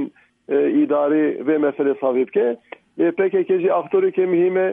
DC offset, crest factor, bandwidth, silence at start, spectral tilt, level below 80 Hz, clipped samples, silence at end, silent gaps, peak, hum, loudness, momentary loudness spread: under 0.1%; 12 dB; 3.7 kHz; 0 s; -10 dB/octave; -76 dBFS; under 0.1%; 0 s; none; -8 dBFS; none; -19 LUFS; 5 LU